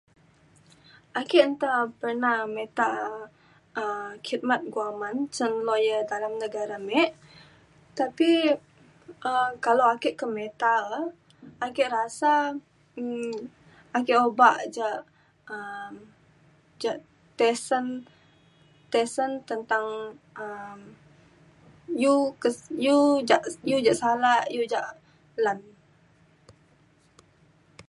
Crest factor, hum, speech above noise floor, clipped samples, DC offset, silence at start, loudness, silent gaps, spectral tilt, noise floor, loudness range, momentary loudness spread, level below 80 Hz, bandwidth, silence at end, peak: 24 dB; none; 36 dB; under 0.1%; under 0.1%; 1.15 s; -26 LUFS; none; -3.5 dB/octave; -61 dBFS; 7 LU; 16 LU; -72 dBFS; 11.5 kHz; 0.1 s; -4 dBFS